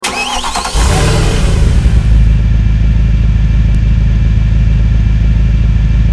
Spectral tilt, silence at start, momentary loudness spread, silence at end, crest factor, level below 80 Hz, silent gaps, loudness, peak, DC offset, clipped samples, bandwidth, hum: -5.5 dB/octave; 0 s; 2 LU; 0 s; 8 dB; -10 dBFS; none; -11 LUFS; 0 dBFS; under 0.1%; 0.4%; 11 kHz; none